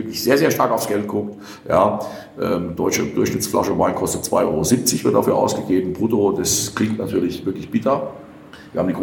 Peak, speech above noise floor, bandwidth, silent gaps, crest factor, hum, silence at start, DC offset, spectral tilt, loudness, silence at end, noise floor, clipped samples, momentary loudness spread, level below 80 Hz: -2 dBFS; 21 dB; 19 kHz; none; 18 dB; none; 0 s; under 0.1%; -4.5 dB/octave; -19 LUFS; 0 s; -41 dBFS; under 0.1%; 9 LU; -50 dBFS